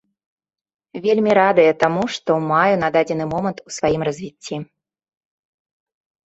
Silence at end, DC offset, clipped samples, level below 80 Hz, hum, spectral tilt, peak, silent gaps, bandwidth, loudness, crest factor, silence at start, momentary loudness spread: 1.65 s; under 0.1%; under 0.1%; -56 dBFS; none; -5.5 dB/octave; -2 dBFS; none; 8.2 kHz; -18 LUFS; 18 dB; 0.95 s; 16 LU